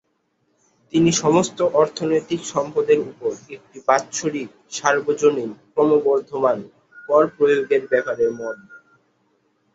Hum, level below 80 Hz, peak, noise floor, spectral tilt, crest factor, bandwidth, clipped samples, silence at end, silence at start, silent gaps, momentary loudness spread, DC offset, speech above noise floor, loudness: none; -62 dBFS; -2 dBFS; -68 dBFS; -4.5 dB/octave; 20 dB; 8 kHz; under 0.1%; 1 s; 0.95 s; none; 11 LU; under 0.1%; 49 dB; -20 LUFS